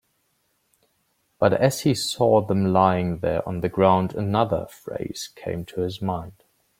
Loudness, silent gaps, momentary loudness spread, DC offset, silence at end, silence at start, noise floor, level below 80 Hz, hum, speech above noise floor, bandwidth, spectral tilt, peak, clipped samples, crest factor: -23 LUFS; none; 13 LU; under 0.1%; 0.5 s; 1.4 s; -70 dBFS; -54 dBFS; none; 48 dB; 16.5 kHz; -6 dB/octave; -2 dBFS; under 0.1%; 20 dB